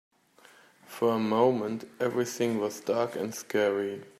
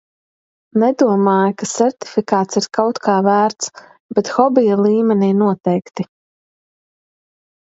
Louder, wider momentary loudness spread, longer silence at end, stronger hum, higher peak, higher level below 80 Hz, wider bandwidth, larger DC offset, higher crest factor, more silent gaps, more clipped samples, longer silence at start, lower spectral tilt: second, -29 LUFS vs -16 LUFS; about the same, 7 LU vs 9 LU; second, 0.1 s vs 1.6 s; neither; second, -10 dBFS vs 0 dBFS; second, -78 dBFS vs -64 dBFS; first, 15.5 kHz vs 8 kHz; neither; about the same, 18 dB vs 16 dB; second, none vs 4.00-4.09 s; neither; first, 0.9 s vs 0.75 s; about the same, -5 dB/octave vs -5.5 dB/octave